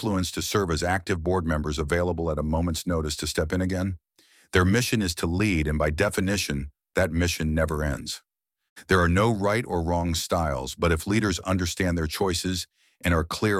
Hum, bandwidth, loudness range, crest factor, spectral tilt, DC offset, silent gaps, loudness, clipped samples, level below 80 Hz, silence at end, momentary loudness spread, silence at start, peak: none; 16 kHz; 2 LU; 20 dB; -5 dB/octave; under 0.1%; 8.70-8.76 s; -25 LUFS; under 0.1%; -38 dBFS; 0 s; 7 LU; 0 s; -4 dBFS